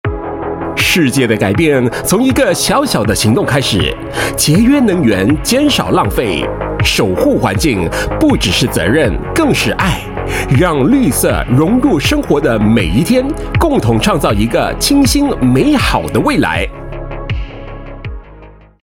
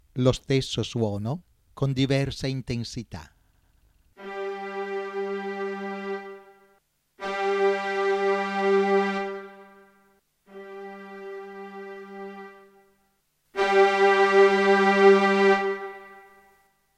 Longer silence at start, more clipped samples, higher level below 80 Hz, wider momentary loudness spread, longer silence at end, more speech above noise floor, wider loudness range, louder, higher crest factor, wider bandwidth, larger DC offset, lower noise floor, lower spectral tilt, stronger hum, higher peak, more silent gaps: about the same, 0.05 s vs 0.15 s; neither; first, -26 dBFS vs -54 dBFS; second, 10 LU vs 22 LU; second, 0.35 s vs 0.8 s; second, 25 dB vs 44 dB; second, 1 LU vs 20 LU; first, -12 LUFS vs -23 LUFS; second, 12 dB vs 20 dB; first, 17 kHz vs 10 kHz; neither; second, -37 dBFS vs -70 dBFS; about the same, -5 dB/octave vs -6 dB/octave; neither; first, 0 dBFS vs -6 dBFS; neither